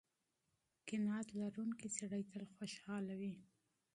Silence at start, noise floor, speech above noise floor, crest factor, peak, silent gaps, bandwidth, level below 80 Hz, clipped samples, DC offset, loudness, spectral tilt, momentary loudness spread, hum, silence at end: 0.85 s; -87 dBFS; 42 dB; 18 dB; -28 dBFS; none; 11.5 kHz; -84 dBFS; under 0.1%; under 0.1%; -46 LUFS; -5 dB/octave; 9 LU; none; 0.5 s